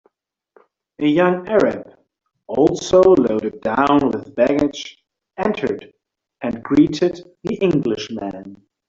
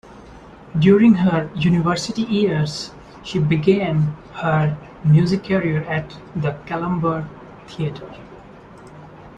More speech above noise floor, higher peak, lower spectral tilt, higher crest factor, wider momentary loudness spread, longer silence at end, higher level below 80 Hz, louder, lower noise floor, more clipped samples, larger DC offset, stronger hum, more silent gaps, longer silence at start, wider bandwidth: first, 50 dB vs 23 dB; about the same, -2 dBFS vs -2 dBFS; second, -6 dB/octave vs -7.5 dB/octave; about the same, 18 dB vs 18 dB; about the same, 16 LU vs 17 LU; first, 0.35 s vs 0.1 s; about the same, -50 dBFS vs -48 dBFS; about the same, -18 LUFS vs -19 LUFS; first, -67 dBFS vs -41 dBFS; neither; neither; neither; neither; first, 1 s vs 0.1 s; second, 7.6 kHz vs 9.4 kHz